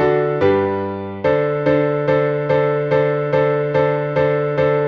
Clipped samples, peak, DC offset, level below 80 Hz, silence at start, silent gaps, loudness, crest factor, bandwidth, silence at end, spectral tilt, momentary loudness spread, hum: under 0.1%; -4 dBFS; under 0.1%; -50 dBFS; 0 s; none; -17 LUFS; 12 dB; 6.2 kHz; 0 s; -9 dB/octave; 2 LU; none